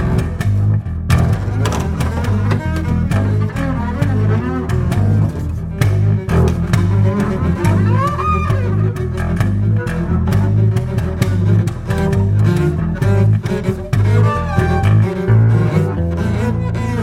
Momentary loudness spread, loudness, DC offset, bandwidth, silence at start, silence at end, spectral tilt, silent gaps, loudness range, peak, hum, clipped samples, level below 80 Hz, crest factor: 5 LU; -16 LUFS; under 0.1%; 12.5 kHz; 0 s; 0 s; -8 dB/octave; none; 2 LU; 0 dBFS; none; under 0.1%; -26 dBFS; 14 dB